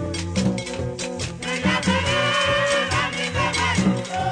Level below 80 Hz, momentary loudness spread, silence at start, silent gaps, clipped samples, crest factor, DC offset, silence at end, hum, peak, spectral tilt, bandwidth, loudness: -42 dBFS; 9 LU; 0 s; none; under 0.1%; 14 dB; under 0.1%; 0 s; none; -8 dBFS; -4 dB/octave; 10 kHz; -22 LUFS